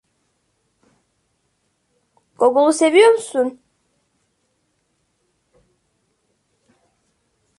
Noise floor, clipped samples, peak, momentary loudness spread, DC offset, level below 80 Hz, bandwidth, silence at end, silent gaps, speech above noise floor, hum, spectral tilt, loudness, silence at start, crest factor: -68 dBFS; under 0.1%; -2 dBFS; 10 LU; under 0.1%; -72 dBFS; 11.5 kHz; 4.1 s; none; 54 dB; none; -2.5 dB/octave; -15 LUFS; 2.4 s; 20 dB